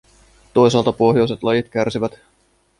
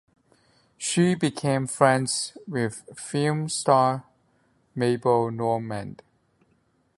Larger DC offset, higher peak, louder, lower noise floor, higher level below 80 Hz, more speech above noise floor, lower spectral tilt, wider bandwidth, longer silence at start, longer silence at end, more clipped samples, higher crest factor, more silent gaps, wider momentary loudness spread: neither; about the same, -2 dBFS vs -2 dBFS; first, -17 LUFS vs -24 LUFS; second, -51 dBFS vs -67 dBFS; first, -50 dBFS vs -64 dBFS; second, 35 dB vs 43 dB; first, -6.5 dB/octave vs -5 dB/octave; about the same, 11 kHz vs 11.5 kHz; second, 0.55 s vs 0.8 s; second, 0.7 s vs 1.05 s; neither; second, 16 dB vs 24 dB; neither; second, 7 LU vs 13 LU